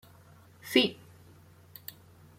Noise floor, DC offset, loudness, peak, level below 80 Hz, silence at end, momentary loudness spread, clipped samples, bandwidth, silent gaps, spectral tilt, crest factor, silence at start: -56 dBFS; under 0.1%; -27 LUFS; -10 dBFS; -74 dBFS; 1.45 s; 26 LU; under 0.1%; 16.5 kHz; none; -3.5 dB/octave; 26 dB; 0.65 s